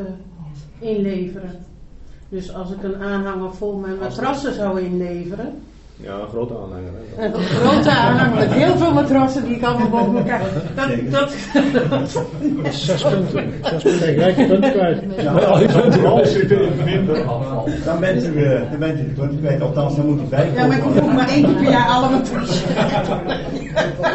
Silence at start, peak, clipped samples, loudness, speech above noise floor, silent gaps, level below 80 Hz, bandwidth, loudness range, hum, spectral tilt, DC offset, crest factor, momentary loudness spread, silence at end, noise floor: 0 s; 0 dBFS; under 0.1%; -17 LUFS; 21 dB; none; -40 dBFS; 8.2 kHz; 10 LU; none; -7 dB/octave; under 0.1%; 18 dB; 15 LU; 0 s; -37 dBFS